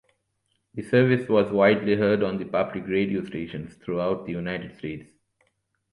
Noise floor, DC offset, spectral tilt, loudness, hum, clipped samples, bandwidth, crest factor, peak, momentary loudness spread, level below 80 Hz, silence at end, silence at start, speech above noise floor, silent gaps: -74 dBFS; under 0.1%; -8 dB/octave; -24 LUFS; none; under 0.1%; 11 kHz; 20 dB; -6 dBFS; 16 LU; -58 dBFS; 0.9 s; 0.75 s; 50 dB; none